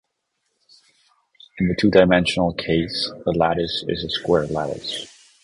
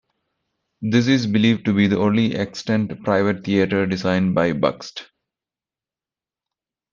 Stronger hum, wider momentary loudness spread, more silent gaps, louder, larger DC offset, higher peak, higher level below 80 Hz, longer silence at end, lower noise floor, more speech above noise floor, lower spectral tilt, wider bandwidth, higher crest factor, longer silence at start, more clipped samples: neither; first, 11 LU vs 7 LU; neither; about the same, -20 LUFS vs -19 LUFS; neither; about the same, 0 dBFS vs -2 dBFS; first, -44 dBFS vs -58 dBFS; second, 0.35 s vs 1.9 s; second, -74 dBFS vs under -90 dBFS; second, 54 dB vs over 71 dB; about the same, -6 dB/octave vs -6.5 dB/octave; first, 11.5 kHz vs 7.4 kHz; about the same, 22 dB vs 18 dB; first, 1.55 s vs 0.8 s; neither